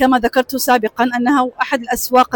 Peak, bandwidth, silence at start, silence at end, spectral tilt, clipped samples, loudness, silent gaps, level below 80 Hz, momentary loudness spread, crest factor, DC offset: -2 dBFS; 19 kHz; 0 s; 0 s; -3 dB/octave; under 0.1%; -16 LUFS; none; -46 dBFS; 4 LU; 12 dB; under 0.1%